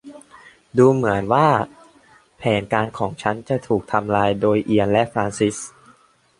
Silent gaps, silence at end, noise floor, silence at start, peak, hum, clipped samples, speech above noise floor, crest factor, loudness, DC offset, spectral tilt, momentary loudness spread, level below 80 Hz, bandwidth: none; 0.7 s; -55 dBFS; 0.05 s; -2 dBFS; none; under 0.1%; 36 dB; 18 dB; -19 LUFS; under 0.1%; -6 dB/octave; 9 LU; -52 dBFS; 11.5 kHz